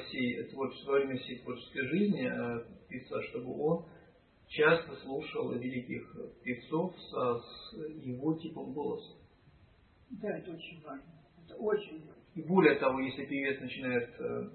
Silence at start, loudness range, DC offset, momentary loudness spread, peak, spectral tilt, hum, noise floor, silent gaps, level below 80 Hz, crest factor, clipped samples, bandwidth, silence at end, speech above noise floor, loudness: 0 s; 8 LU; under 0.1%; 18 LU; -10 dBFS; -4.5 dB/octave; none; -63 dBFS; none; -70 dBFS; 26 dB; under 0.1%; 4.3 kHz; 0 s; 29 dB; -35 LUFS